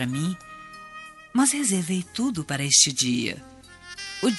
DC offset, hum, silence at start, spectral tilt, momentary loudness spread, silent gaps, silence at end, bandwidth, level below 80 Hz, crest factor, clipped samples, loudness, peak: under 0.1%; none; 0 s; -2.5 dB/octave; 24 LU; none; 0 s; 11.5 kHz; -62 dBFS; 22 dB; under 0.1%; -22 LUFS; -4 dBFS